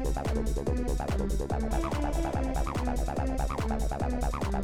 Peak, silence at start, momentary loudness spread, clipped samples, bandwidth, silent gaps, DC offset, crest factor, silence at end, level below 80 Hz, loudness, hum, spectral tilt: -18 dBFS; 0 s; 1 LU; under 0.1%; 15 kHz; none; 0.2%; 12 dB; 0 s; -32 dBFS; -31 LUFS; none; -6.5 dB/octave